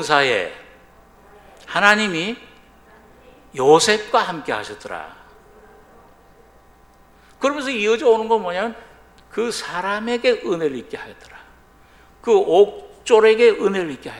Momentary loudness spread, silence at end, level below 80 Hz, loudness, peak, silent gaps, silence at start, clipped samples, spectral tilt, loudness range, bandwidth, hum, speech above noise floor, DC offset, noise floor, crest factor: 18 LU; 0 s; -56 dBFS; -18 LUFS; 0 dBFS; none; 0 s; under 0.1%; -3.5 dB/octave; 7 LU; 12.5 kHz; none; 33 dB; under 0.1%; -51 dBFS; 20 dB